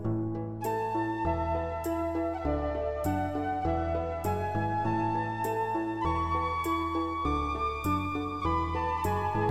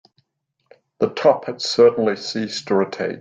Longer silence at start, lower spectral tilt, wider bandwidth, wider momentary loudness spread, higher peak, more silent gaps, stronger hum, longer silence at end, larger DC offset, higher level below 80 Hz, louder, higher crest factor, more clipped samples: second, 0 s vs 1 s; first, -7 dB/octave vs -4.5 dB/octave; first, 16.5 kHz vs 7.8 kHz; second, 3 LU vs 9 LU; second, -16 dBFS vs -2 dBFS; neither; neither; about the same, 0 s vs 0 s; first, 0.2% vs under 0.1%; first, -42 dBFS vs -66 dBFS; second, -31 LUFS vs -19 LUFS; about the same, 14 dB vs 18 dB; neither